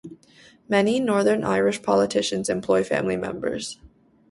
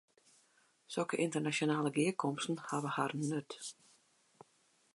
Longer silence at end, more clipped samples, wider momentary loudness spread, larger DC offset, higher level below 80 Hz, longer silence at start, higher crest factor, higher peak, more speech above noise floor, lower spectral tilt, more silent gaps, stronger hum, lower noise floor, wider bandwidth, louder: second, 0.45 s vs 1.25 s; neither; about the same, 8 LU vs 10 LU; neither; first, -58 dBFS vs -86 dBFS; second, 0.05 s vs 0.9 s; about the same, 20 dB vs 20 dB; first, -4 dBFS vs -18 dBFS; second, 31 dB vs 37 dB; about the same, -4.5 dB/octave vs -5 dB/octave; neither; neither; second, -53 dBFS vs -73 dBFS; about the same, 11.5 kHz vs 11.5 kHz; first, -23 LUFS vs -36 LUFS